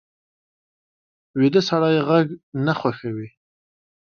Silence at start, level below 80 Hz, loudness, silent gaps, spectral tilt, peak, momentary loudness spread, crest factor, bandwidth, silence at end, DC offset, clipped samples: 1.35 s; -64 dBFS; -20 LUFS; 2.43-2.52 s; -7 dB/octave; -4 dBFS; 13 LU; 20 dB; 6.8 kHz; 0.85 s; under 0.1%; under 0.1%